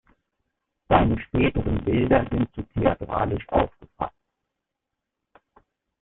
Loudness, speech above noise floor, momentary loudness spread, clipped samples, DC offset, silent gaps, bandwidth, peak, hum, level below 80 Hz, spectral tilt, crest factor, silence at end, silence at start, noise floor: -24 LUFS; 61 dB; 11 LU; under 0.1%; under 0.1%; none; 4.1 kHz; -2 dBFS; none; -38 dBFS; -11.5 dB/octave; 24 dB; 1.95 s; 0.9 s; -83 dBFS